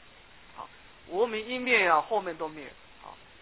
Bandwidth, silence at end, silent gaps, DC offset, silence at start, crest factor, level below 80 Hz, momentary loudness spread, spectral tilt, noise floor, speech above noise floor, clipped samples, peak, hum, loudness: 4 kHz; 0.3 s; none; 0.1%; 0.55 s; 22 dB; -64 dBFS; 25 LU; -0.5 dB/octave; -55 dBFS; 26 dB; under 0.1%; -10 dBFS; none; -27 LUFS